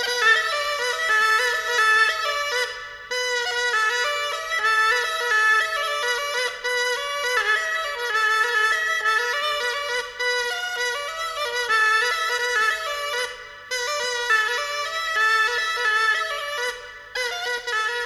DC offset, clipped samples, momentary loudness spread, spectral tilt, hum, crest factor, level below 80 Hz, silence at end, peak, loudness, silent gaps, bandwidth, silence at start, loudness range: under 0.1%; under 0.1%; 9 LU; 2 dB/octave; none; 16 dB; -60 dBFS; 0 s; -6 dBFS; -21 LUFS; none; 16.5 kHz; 0 s; 2 LU